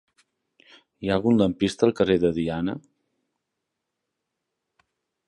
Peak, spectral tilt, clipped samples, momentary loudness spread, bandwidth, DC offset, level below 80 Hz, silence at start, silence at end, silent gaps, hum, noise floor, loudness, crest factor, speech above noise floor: -4 dBFS; -6.5 dB/octave; under 0.1%; 10 LU; 11 kHz; under 0.1%; -52 dBFS; 1 s; 2.5 s; none; none; -82 dBFS; -23 LUFS; 22 dB; 60 dB